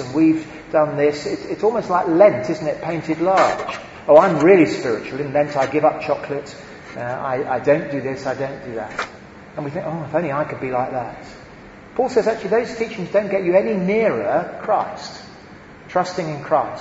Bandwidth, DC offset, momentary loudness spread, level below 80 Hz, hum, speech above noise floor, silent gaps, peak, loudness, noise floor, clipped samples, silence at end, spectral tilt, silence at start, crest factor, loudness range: 8 kHz; under 0.1%; 15 LU; -54 dBFS; none; 22 dB; none; 0 dBFS; -19 LUFS; -41 dBFS; under 0.1%; 0 s; -6.5 dB/octave; 0 s; 20 dB; 8 LU